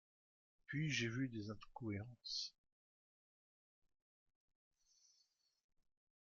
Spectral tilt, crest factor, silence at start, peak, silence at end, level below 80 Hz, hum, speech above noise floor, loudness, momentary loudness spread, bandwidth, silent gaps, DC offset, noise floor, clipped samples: -4 dB/octave; 22 dB; 0.7 s; -28 dBFS; 3.75 s; -78 dBFS; none; 37 dB; -45 LUFS; 10 LU; 7.2 kHz; none; under 0.1%; -82 dBFS; under 0.1%